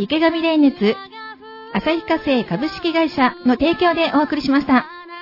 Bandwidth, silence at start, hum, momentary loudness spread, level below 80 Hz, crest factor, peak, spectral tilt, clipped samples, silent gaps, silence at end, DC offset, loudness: 5.8 kHz; 0 s; none; 13 LU; -48 dBFS; 14 dB; -4 dBFS; -6.5 dB/octave; under 0.1%; none; 0 s; under 0.1%; -18 LUFS